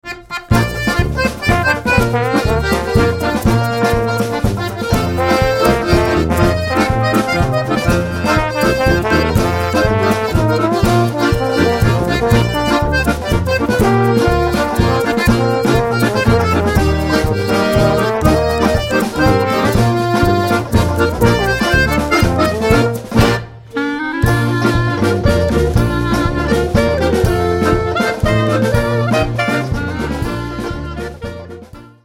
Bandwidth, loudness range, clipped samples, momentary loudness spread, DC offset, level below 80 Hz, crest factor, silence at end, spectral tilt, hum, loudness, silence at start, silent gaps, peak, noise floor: 16.5 kHz; 2 LU; under 0.1%; 5 LU; under 0.1%; -24 dBFS; 14 dB; 0.15 s; -6 dB/octave; none; -14 LUFS; 0.05 s; none; 0 dBFS; -35 dBFS